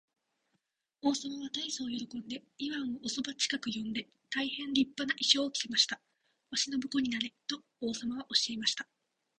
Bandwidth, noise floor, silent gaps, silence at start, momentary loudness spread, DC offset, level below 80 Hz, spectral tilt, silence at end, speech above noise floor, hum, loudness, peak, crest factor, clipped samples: 10.5 kHz; -82 dBFS; none; 1.05 s; 12 LU; under 0.1%; -74 dBFS; -1.5 dB/octave; 0.55 s; 47 dB; none; -33 LUFS; -10 dBFS; 24 dB; under 0.1%